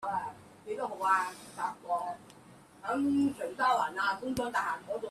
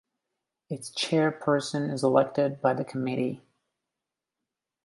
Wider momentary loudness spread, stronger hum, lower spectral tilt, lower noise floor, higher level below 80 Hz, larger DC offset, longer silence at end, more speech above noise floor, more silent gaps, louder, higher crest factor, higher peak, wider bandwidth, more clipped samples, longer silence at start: about the same, 13 LU vs 12 LU; neither; about the same, -4.5 dB/octave vs -5.5 dB/octave; second, -56 dBFS vs -88 dBFS; first, -68 dBFS vs -74 dBFS; neither; second, 0 s vs 1.45 s; second, 24 dB vs 61 dB; neither; second, -32 LUFS vs -27 LUFS; second, 16 dB vs 22 dB; second, -16 dBFS vs -8 dBFS; first, 14 kHz vs 11.5 kHz; neither; second, 0 s vs 0.7 s